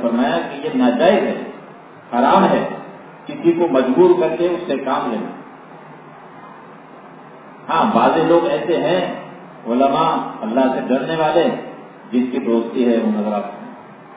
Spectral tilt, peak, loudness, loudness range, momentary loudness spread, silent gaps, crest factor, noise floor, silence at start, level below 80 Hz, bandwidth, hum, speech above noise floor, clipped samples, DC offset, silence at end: -10 dB/octave; 0 dBFS; -17 LUFS; 5 LU; 23 LU; none; 18 dB; -39 dBFS; 0 s; -60 dBFS; 4 kHz; none; 23 dB; under 0.1%; under 0.1%; 0 s